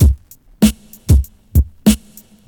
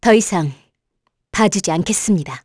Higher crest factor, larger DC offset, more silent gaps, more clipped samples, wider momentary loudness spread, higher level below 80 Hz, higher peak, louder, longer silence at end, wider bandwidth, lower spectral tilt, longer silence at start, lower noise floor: about the same, 14 dB vs 16 dB; neither; neither; neither; about the same, 7 LU vs 9 LU; first, -18 dBFS vs -48 dBFS; about the same, 0 dBFS vs -2 dBFS; about the same, -16 LUFS vs -17 LUFS; first, 0.5 s vs 0.05 s; first, 19.5 kHz vs 11 kHz; first, -6 dB/octave vs -4.5 dB/octave; about the same, 0 s vs 0 s; second, -43 dBFS vs -71 dBFS